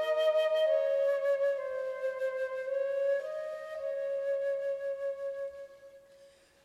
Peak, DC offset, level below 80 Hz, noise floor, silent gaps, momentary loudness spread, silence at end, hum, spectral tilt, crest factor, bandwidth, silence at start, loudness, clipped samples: -18 dBFS; under 0.1%; -80 dBFS; -60 dBFS; none; 11 LU; 0.35 s; none; -1.5 dB/octave; 14 dB; 12.5 kHz; 0 s; -32 LUFS; under 0.1%